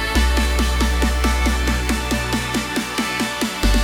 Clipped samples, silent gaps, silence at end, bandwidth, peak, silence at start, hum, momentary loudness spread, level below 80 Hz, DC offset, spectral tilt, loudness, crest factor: under 0.1%; none; 0 s; 17 kHz; -4 dBFS; 0 s; none; 3 LU; -22 dBFS; under 0.1%; -4 dB/octave; -20 LUFS; 14 dB